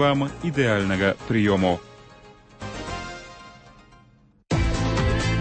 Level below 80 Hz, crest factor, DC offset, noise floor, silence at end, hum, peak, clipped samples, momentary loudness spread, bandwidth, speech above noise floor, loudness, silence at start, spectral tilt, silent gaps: -36 dBFS; 18 dB; under 0.1%; -56 dBFS; 0 s; none; -6 dBFS; under 0.1%; 16 LU; 8.8 kHz; 34 dB; -24 LUFS; 0 s; -6 dB/octave; none